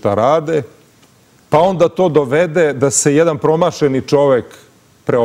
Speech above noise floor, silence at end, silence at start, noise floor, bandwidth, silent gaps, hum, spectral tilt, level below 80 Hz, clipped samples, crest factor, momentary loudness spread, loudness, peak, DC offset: 36 dB; 0 s; 0.05 s; -49 dBFS; 15.5 kHz; none; none; -5 dB/octave; -52 dBFS; under 0.1%; 14 dB; 6 LU; -14 LUFS; 0 dBFS; under 0.1%